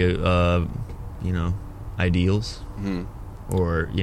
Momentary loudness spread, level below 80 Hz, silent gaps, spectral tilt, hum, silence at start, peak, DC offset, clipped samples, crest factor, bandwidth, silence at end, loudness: 14 LU; -34 dBFS; none; -7 dB/octave; none; 0 s; -6 dBFS; under 0.1%; under 0.1%; 18 dB; 12 kHz; 0 s; -25 LUFS